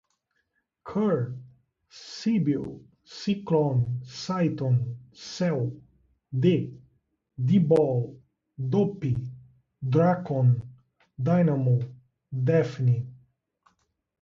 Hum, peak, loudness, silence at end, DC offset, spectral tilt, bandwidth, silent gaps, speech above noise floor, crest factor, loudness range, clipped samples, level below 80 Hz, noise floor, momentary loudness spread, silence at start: none; -8 dBFS; -26 LUFS; 1.1 s; under 0.1%; -8.5 dB/octave; 7.4 kHz; none; 51 dB; 18 dB; 3 LU; under 0.1%; -60 dBFS; -76 dBFS; 17 LU; 0.85 s